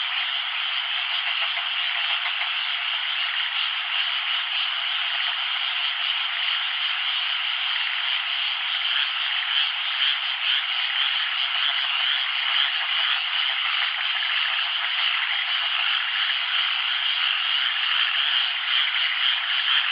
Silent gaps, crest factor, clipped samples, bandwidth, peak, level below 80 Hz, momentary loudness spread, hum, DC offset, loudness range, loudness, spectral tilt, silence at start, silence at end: none; 16 dB; under 0.1%; 5.4 kHz; -8 dBFS; under -90 dBFS; 3 LU; none; under 0.1%; 2 LU; -22 LUFS; 17 dB/octave; 0 s; 0 s